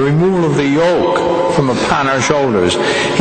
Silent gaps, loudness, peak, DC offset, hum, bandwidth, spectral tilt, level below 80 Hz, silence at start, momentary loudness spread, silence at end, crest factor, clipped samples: none; -13 LUFS; 0 dBFS; under 0.1%; none; 9.2 kHz; -5 dB/octave; -42 dBFS; 0 s; 1 LU; 0 s; 12 dB; under 0.1%